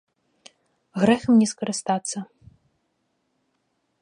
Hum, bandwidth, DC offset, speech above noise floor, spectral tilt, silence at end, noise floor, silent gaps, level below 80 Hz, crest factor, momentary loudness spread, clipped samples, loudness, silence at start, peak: none; 11 kHz; under 0.1%; 52 dB; -5 dB/octave; 1.8 s; -73 dBFS; none; -62 dBFS; 20 dB; 17 LU; under 0.1%; -22 LUFS; 0.95 s; -6 dBFS